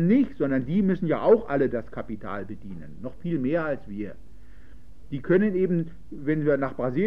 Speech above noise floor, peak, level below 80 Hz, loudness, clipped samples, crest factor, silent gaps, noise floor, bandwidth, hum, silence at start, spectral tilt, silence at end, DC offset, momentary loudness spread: 25 dB; -8 dBFS; -50 dBFS; -25 LUFS; under 0.1%; 18 dB; none; -50 dBFS; 5.6 kHz; none; 0 s; -10.5 dB/octave; 0 s; 1%; 16 LU